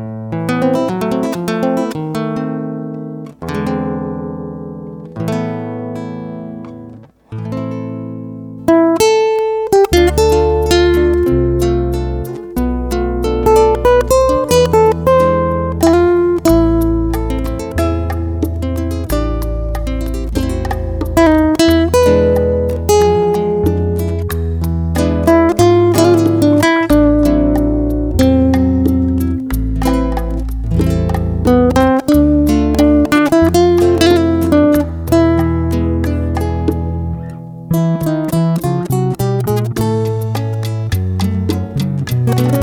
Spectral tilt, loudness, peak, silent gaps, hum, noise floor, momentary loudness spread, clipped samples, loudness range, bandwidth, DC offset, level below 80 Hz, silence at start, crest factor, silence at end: -6.5 dB/octave; -14 LUFS; 0 dBFS; none; none; -36 dBFS; 12 LU; under 0.1%; 10 LU; over 20 kHz; under 0.1%; -24 dBFS; 0 s; 14 dB; 0 s